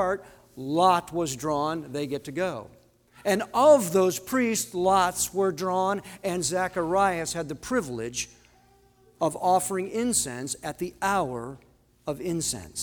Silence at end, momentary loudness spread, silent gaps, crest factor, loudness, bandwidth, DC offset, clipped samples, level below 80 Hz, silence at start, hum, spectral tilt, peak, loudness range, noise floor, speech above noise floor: 0 s; 11 LU; none; 20 dB; -26 LUFS; over 20 kHz; under 0.1%; under 0.1%; -58 dBFS; 0 s; none; -4 dB/octave; -6 dBFS; 5 LU; -59 dBFS; 33 dB